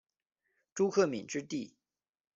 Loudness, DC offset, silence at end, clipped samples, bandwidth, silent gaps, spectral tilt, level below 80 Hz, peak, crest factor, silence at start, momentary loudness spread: -33 LUFS; under 0.1%; 0.7 s; under 0.1%; 7.8 kHz; none; -5 dB/octave; -78 dBFS; -16 dBFS; 20 dB; 0.75 s; 17 LU